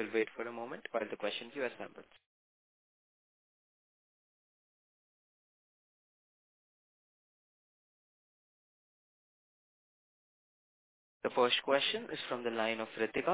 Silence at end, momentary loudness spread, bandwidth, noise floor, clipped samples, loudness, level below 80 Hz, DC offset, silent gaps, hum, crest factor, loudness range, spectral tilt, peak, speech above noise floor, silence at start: 0 s; 12 LU; 4 kHz; under -90 dBFS; under 0.1%; -36 LUFS; -84 dBFS; under 0.1%; 2.26-11.21 s; none; 26 dB; 14 LU; -1 dB/octave; -16 dBFS; over 54 dB; 0 s